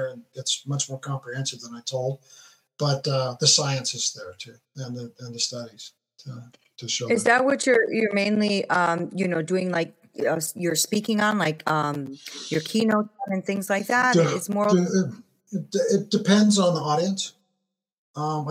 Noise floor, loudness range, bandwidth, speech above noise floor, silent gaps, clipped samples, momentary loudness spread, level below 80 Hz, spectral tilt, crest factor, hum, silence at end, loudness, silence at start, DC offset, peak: -80 dBFS; 4 LU; 16 kHz; 56 dB; 17.93-18.14 s; under 0.1%; 17 LU; -76 dBFS; -4 dB/octave; 22 dB; none; 0 s; -23 LUFS; 0 s; under 0.1%; -4 dBFS